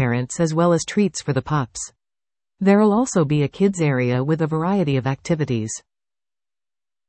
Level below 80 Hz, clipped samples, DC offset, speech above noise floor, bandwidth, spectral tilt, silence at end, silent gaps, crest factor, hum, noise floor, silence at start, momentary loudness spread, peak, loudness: -54 dBFS; under 0.1%; under 0.1%; over 71 dB; 8.8 kHz; -6 dB/octave; 1.3 s; none; 16 dB; none; under -90 dBFS; 0 s; 8 LU; -4 dBFS; -20 LUFS